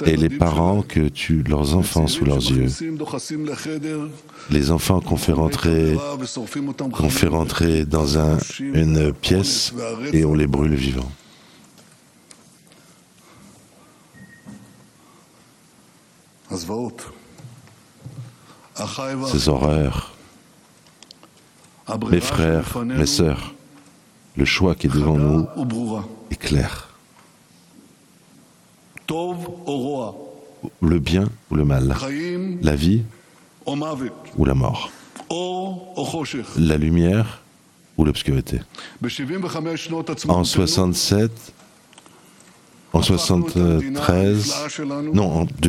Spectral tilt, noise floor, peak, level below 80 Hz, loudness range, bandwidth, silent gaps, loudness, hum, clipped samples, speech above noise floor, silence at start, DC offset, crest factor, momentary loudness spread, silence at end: -5.5 dB/octave; -53 dBFS; 0 dBFS; -34 dBFS; 11 LU; 16 kHz; none; -21 LUFS; none; under 0.1%; 33 dB; 0 s; under 0.1%; 22 dB; 13 LU; 0 s